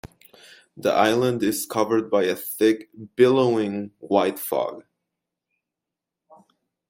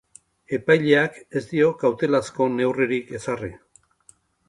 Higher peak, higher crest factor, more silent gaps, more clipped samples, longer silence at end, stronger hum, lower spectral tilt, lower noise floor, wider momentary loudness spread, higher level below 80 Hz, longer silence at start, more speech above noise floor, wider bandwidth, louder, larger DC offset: about the same, -4 dBFS vs -2 dBFS; about the same, 20 dB vs 20 dB; neither; neither; first, 2.1 s vs 0.9 s; neither; about the same, -5 dB/octave vs -6 dB/octave; first, -86 dBFS vs -57 dBFS; about the same, 10 LU vs 12 LU; about the same, -64 dBFS vs -60 dBFS; second, 0.05 s vs 0.5 s; first, 64 dB vs 36 dB; first, 16.5 kHz vs 11.5 kHz; about the same, -22 LUFS vs -22 LUFS; neither